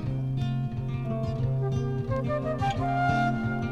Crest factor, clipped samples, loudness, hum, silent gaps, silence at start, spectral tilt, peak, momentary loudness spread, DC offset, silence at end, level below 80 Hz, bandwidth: 16 dB; under 0.1%; -28 LUFS; none; none; 0 s; -8 dB/octave; -12 dBFS; 5 LU; under 0.1%; 0 s; -44 dBFS; 7.2 kHz